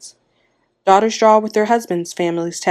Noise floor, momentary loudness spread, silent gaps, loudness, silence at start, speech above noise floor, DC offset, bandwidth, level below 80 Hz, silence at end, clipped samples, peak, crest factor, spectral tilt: -63 dBFS; 8 LU; none; -16 LUFS; 0.05 s; 48 dB; under 0.1%; 14.5 kHz; -66 dBFS; 0 s; under 0.1%; 0 dBFS; 16 dB; -4.5 dB/octave